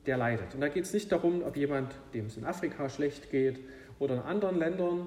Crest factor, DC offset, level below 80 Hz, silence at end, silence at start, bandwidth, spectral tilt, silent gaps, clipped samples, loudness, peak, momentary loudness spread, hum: 16 dB; under 0.1%; -60 dBFS; 0 s; 0.05 s; 14.5 kHz; -6.5 dB/octave; none; under 0.1%; -33 LUFS; -16 dBFS; 9 LU; none